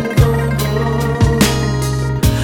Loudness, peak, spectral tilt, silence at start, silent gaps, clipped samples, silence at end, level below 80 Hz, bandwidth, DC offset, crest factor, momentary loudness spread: -15 LUFS; 0 dBFS; -5.5 dB/octave; 0 s; none; under 0.1%; 0 s; -22 dBFS; 18.5 kHz; under 0.1%; 14 dB; 4 LU